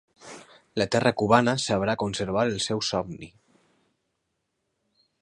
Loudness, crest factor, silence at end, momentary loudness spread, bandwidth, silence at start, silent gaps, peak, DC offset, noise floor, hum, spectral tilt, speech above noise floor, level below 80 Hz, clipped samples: -25 LUFS; 24 dB; 1.95 s; 24 LU; 11 kHz; 0.25 s; none; -4 dBFS; under 0.1%; -78 dBFS; none; -4.5 dB/octave; 54 dB; -56 dBFS; under 0.1%